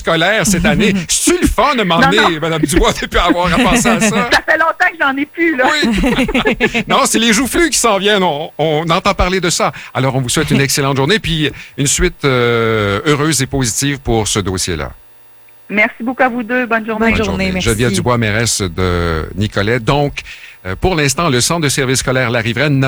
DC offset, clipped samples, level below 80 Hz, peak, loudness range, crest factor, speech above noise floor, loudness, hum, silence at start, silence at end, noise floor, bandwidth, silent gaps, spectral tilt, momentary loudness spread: under 0.1%; under 0.1%; -30 dBFS; 0 dBFS; 4 LU; 12 dB; 27 dB; -13 LUFS; none; 0 s; 0 s; -40 dBFS; over 20 kHz; none; -4 dB/octave; 6 LU